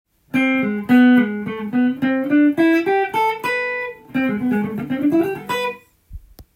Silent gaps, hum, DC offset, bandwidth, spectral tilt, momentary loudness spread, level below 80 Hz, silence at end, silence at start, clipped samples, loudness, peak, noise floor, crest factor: none; none; under 0.1%; 16 kHz; -6.5 dB/octave; 10 LU; -50 dBFS; 0.15 s; 0.35 s; under 0.1%; -18 LUFS; -4 dBFS; -39 dBFS; 16 dB